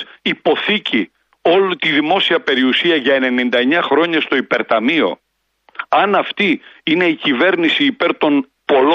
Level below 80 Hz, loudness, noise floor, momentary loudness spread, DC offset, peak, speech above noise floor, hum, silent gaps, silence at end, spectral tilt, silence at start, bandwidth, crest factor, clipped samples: -64 dBFS; -15 LUFS; -57 dBFS; 6 LU; under 0.1%; -2 dBFS; 42 dB; none; none; 0 s; -6 dB/octave; 0 s; 7.4 kHz; 14 dB; under 0.1%